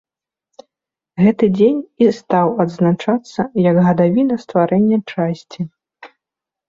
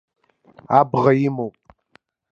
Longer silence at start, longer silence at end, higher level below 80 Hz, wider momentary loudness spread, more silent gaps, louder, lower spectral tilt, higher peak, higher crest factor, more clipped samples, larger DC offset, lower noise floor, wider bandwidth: first, 1.15 s vs 0.7 s; second, 0.65 s vs 0.85 s; first, -56 dBFS vs -62 dBFS; second, 9 LU vs 13 LU; neither; about the same, -16 LUFS vs -18 LUFS; about the same, -8.5 dB/octave vs -9 dB/octave; about the same, -2 dBFS vs 0 dBFS; second, 14 dB vs 20 dB; neither; neither; first, -86 dBFS vs -58 dBFS; about the same, 7.4 kHz vs 7.2 kHz